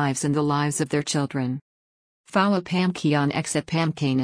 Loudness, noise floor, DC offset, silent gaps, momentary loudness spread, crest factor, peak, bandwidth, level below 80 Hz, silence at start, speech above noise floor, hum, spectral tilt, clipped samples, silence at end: -24 LUFS; under -90 dBFS; under 0.1%; 1.61-2.24 s; 5 LU; 16 dB; -8 dBFS; 10.5 kHz; -62 dBFS; 0 s; over 67 dB; none; -5 dB/octave; under 0.1%; 0 s